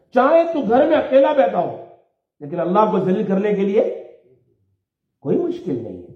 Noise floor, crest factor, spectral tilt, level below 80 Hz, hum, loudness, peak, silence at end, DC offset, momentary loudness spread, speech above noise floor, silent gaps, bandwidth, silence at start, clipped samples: -73 dBFS; 16 dB; -8.5 dB/octave; -64 dBFS; none; -18 LUFS; -4 dBFS; 0.05 s; under 0.1%; 14 LU; 56 dB; none; 6.4 kHz; 0.15 s; under 0.1%